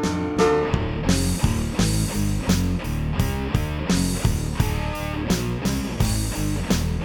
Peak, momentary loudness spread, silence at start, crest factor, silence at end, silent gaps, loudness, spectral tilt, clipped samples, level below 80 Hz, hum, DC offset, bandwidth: -4 dBFS; 4 LU; 0 s; 18 dB; 0 s; none; -23 LUFS; -5.5 dB/octave; under 0.1%; -30 dBFS; none; under 0.1%; 20 kHz